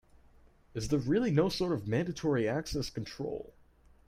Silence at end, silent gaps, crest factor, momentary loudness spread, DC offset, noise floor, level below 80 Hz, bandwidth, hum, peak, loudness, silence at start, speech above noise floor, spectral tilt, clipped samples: 0.6 s; none; 20 dB; 12 LU; under 0.1%; -61 dBFS; -52 dBFS; 15.5 kHz; none; -14 dBFS; -32 LUFS; 0.75 s; 29 dB; -6 dB/octave; under 0.1%